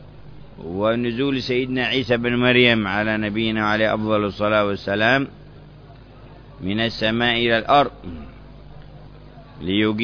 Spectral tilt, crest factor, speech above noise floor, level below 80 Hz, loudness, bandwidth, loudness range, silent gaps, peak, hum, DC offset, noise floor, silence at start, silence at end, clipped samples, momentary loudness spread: -6.5 dB/octave; 20 dB; 23 dB; -46 dBFS; -19 LUFS; 5.4 kHz; 3 LU; none; -2 dBFS; none; under 0.1%; -43 dBFS; 0 s; 0 s; under 0.1%; 14 LU